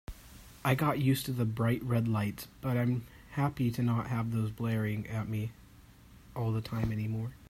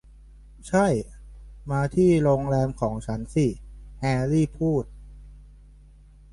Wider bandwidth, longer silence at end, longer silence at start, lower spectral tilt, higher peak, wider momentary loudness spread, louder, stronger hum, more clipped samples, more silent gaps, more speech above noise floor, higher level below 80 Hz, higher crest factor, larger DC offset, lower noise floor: first, 16 kHz vs 11.5 kHz; second, 0.05 s vs 0.9 s; second, 0.1 s vs 0.65 s; about the same, -7 dB/octave vs -7.5 dB/octave; second, -14 dBFS vs -10 dBFS; second, 9 LU vs 19 LU; second, -33 LUFS vs -24 LUFS; neither; neither; neither; about the same, 25 dB vs 27 dB; second, -54 dBFS vs -42 dBFS; about the same, 18 dB vs 16 dB; neither; first, -56 dBFS vs -50 dBFS